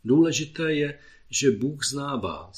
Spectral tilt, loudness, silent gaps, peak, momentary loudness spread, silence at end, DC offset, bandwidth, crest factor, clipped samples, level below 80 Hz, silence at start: -4.5 dB/octave; -25 LUFS; none; -8 dBFS; 9 LU; 0 s; under 0.1%; 14 kHz; 18 dB; under 0.1%; -58 dBFS; 0.05 s